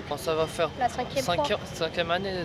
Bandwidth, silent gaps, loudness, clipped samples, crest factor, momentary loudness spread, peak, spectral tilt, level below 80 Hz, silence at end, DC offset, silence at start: 16 kHz; none; -28 LUFS; under 0.1%; 16 dB; 3 LU; -12 dBFS; -4 dB/octave; -50 dBFS; 0 s; under 0.1%; 0 s